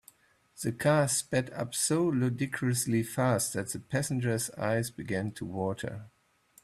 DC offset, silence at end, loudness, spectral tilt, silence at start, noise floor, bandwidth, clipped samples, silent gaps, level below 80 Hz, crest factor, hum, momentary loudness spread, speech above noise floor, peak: under 0.1%; 0.55 s; -30 LUFS; -5 dB/octave; 0.55 s; -64 dBFS; 15 kHz; under 0.1%; none; -64 dBFS; 18 dB; none; 9 LU; 34 dB; -12 dBFS